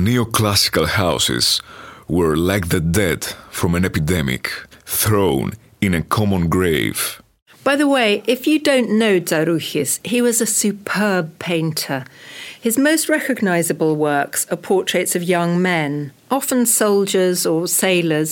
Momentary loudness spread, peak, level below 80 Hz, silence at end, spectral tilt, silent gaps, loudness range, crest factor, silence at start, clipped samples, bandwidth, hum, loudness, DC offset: 8 LU; -2 dBFS; -42 dBFS; 0 s; -4 dB/octave; 7.42-7.46 s; 2 LU; 16 dB; 0 s; under 0.1%; 17 kHz; none; -17 LUFS; under 0.1%